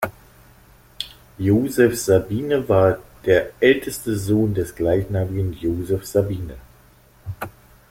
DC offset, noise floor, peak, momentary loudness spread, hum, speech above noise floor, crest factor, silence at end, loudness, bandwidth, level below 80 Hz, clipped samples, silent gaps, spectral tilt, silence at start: under 0.1%; -51 dBFS; -2 dBFS; 16 LU; none; 32 dB; 18 dB; 0.4 s; -20 LUFS; 16.5 kHz; -44 dBFS; under 0.1%; none; -6 dB/octave; 0 s